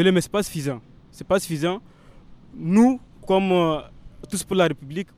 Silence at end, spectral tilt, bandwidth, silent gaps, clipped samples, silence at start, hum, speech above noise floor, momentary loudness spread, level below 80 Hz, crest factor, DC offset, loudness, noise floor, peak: 0.15 s; -5.5 dB/octave; 16 kHz; none; under 0.1%; 0 s; none; 25 dB; 13 LU; -50 dBFS; 18 dB; under 0.1%; -22 LUFS; -46 dBFS; -6 dBFS